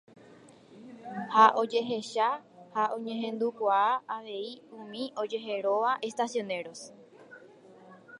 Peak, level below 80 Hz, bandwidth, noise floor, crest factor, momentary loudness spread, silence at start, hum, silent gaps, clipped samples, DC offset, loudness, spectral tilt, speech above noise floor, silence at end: -6 dBFS; -86 dBFS; 11 kHz; -55 dBFS; 24 dB; 20 LU; 0.5 s; none; none; under 0.1%; under 0.1%; -29 LUFS; -4 dB/octave; 26 dB; 0 s